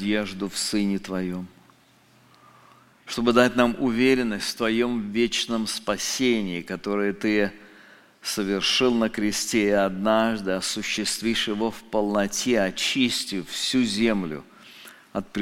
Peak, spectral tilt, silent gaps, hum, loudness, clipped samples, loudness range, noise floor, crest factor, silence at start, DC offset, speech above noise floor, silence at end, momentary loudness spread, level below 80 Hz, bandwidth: -2 dBFS; -3.5 dB/octave; none; none; -24 LUFS; under 0.1%; 3 LU; -57 dBFS; 22 dB; 0 s; under 0.1%; 34 dB; 0 s; 10 LU; -52 dBFS; 16.5 kHz